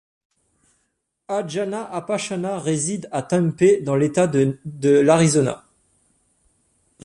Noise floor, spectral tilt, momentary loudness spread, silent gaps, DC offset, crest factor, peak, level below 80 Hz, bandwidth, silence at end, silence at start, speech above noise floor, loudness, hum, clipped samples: -73 dBFS; -5.5 dB/octave; 11 LU; none; under 0.1%; 18 dB; -2 dBFS; -60 dBFS; 11.5 kHz; 1.45 s; 1.3 s; 53 dB; -20 LUFS; none; under 0.1%